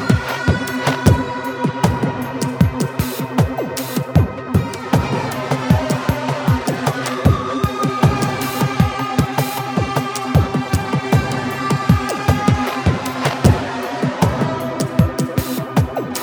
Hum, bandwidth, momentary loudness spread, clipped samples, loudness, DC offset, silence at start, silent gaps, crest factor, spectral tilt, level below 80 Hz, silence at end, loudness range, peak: none; over 20 kHz; 5 LU; under 0.1%; -18 LUFS; under 0.1%; 0 s; none; 18 dB; -6 dB/octave; -32 dBFS; 0 s; 2 LU; 0 dBFS